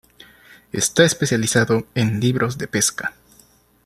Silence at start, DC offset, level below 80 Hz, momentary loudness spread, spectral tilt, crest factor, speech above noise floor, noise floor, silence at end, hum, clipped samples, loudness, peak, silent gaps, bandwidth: 0.75 s; under 0.1%; -54 dBFS; 9 LU; -4 dB/octave; 20 dB; 35 dB; -54 dBFS; 0.75 s; none; under 0.1%; -19 LUFS; -2 dBFS; none; 14.5 kHz